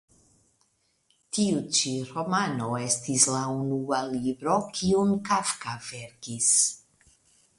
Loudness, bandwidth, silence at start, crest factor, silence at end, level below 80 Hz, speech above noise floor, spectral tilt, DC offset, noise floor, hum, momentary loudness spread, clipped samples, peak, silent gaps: -25 LUFS; 11.5 kHz; 1.35 s; 22 dB; 0.8 s; -62 dBFS; 43 dB; -3.5 dB/octave; under 0.1%; -70 dBFS; none; 13 LU; under 0.1%; -6 dBFS; none